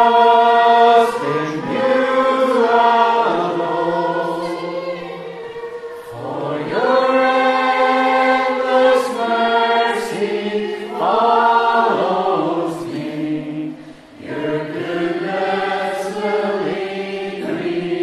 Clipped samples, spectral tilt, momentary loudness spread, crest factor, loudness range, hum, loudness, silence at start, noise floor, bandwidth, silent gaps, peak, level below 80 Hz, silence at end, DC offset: under 0.1%; -5 dB/octave; 14 LU; 16 dB; 7 LU; none; -17 LUFS; 0 s; -37 dBFS; 13 kHz; none; 0 dBFS; -62 dBFS; 0 s; under 0.1%